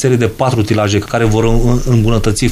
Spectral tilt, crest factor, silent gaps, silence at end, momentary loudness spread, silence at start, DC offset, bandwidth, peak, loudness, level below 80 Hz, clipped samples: -6 dB/octave; 12 dB; none; 0 s; 2 LU; 0 s; under 0.1%; 15.5 kHz; 0 dBFS; -13 LUFS; -20 dBFS; 0.2%